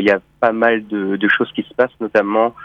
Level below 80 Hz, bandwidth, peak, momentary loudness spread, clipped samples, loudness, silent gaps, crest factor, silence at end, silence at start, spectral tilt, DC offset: -58 dBFS; 7.2 kHz; -2 dBFS; 4 LU; under 0.1%; -17 LUFS; none; 16 dB; 0 s; 0 s; -7 dB/octave; under 0.1%